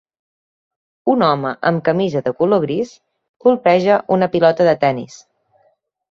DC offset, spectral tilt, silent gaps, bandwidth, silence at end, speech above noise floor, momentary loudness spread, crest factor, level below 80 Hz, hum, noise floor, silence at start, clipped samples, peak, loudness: under 0.1%; -7 dB/octave; 3.29-3.40 s; 7.4 kHz; 1.05 s; 45 dB; 10 LU; 16 dB; -60 dBFS; none; -61 dBFS; 1.05 s; under 0.1%; 0 dBFS; -16 LUFS